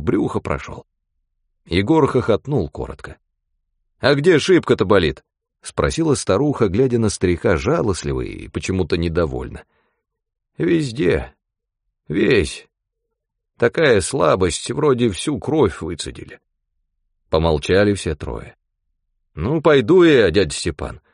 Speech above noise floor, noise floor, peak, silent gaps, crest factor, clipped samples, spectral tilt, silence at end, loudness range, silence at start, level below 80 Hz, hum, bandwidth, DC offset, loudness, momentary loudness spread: 61 dB; -79 dBFS; -2 dBFS; none; 18 dB; under 0.1%; -5.5 dB/octave; 0.15 s; 5 LU; 0 s; -38 dBFS; none; 10.5 kHz; under 0.1%; -18 LUFS; 14 LU